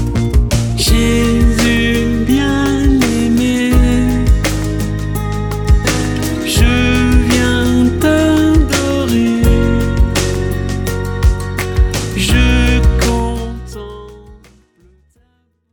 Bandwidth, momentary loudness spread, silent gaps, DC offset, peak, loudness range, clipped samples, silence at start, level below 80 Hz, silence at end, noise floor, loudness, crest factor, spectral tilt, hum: over 20 kHz; 7 LU; none; under 0.1%; 0 dBFS; 3 LU; under 0.1%; 0 s; -18 dBFS; 1.35 s; -59 dBFS; -13 LUFS; 12 dB; -5.5 dB/octave; none